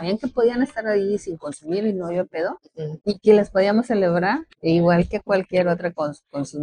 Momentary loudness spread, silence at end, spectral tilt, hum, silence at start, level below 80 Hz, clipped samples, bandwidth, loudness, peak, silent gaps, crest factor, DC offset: 12 LU; 0 s; -7 dB/octave; none; 0 s; -50 dBFS; under 0.1%; 10 kHz; -21 LUFS; -2 dBFS; none; 18 dB; under 0.1%